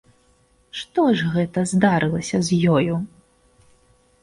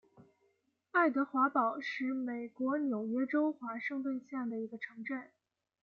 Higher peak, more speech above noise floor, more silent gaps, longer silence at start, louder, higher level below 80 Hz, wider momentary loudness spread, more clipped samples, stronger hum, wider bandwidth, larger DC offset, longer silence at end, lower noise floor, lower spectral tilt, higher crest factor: first, -4 dBFS vs -18 dBFS; about the same, 40 dB vs 42 dB; neither; first, 0.75 s vs 0.2 s; first, -20 LUFS vs -35 LUFS; first, -52 dBFS vs -86 dBFS; about the same, 12 LU vs 11 LU; neither; neither; first, 11.5 kHz vs 6.8 kHz; neither; first, 1.15 s vs 0.55 s; second, -59 dBFS vs -77 dBFS; about the same, -6 dB/octave vs -6.5 dB/octave; about the same, 16 dB vs 18 dB